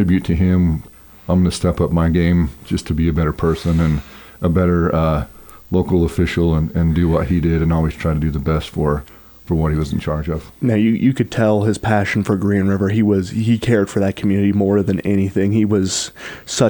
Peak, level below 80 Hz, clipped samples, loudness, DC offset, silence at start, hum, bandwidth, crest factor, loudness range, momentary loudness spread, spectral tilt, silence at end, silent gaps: -2 dBFS; -32 dBFS; under 0.1%; -17 LUFS; under 0.1%; 0 s; none; 19.5 kHz; 14 dB; 2 LU; 6 LU; -7 dB/octave; 0 s; none